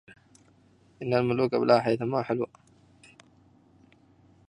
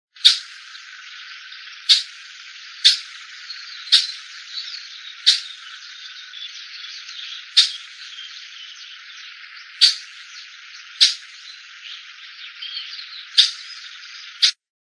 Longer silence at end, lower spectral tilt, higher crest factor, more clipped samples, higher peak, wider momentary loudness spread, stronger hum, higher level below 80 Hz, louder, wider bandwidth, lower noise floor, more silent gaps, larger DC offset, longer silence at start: first, 2 s vs 0.3 s; first, -7.5 dB/octave vs 9 dB/octave; about the same, 24 dB vs 24 dB; neither; second, -6 dBFS vs 0 dBFS; second, 11 LU vs 22 LU; neither; first, -68 dBFS vs under -90 dBFS; second, -26 LUFS vs -17 LUFS; about the same, 10.5 kHz vs 11 kHz; first, -61 dBFS vs -40 dBFS; neither; neither; first, 1 s vs 0.25 s